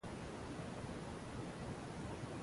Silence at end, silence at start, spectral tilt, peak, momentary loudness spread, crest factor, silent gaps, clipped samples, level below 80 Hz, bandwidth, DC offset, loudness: 0 s; 0.05 s; -6 dB/octave; -34 dBFS; 1 LU; 14 dB; none; under 0.1%; -58 dBFS; 11.5 kHz; under 0.1%; -48 LUFS